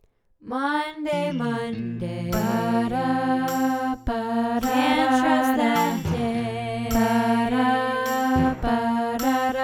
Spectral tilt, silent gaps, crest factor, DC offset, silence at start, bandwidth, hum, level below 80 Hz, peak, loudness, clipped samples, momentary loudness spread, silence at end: -5.5 dB/octave; none; 16 dB; under 0.1%; 0.45 s; 17.5 kHz; none; -42 dBFS; -6 dBFS; -23 LUFS; under 0.1%; 7 LU; 0 s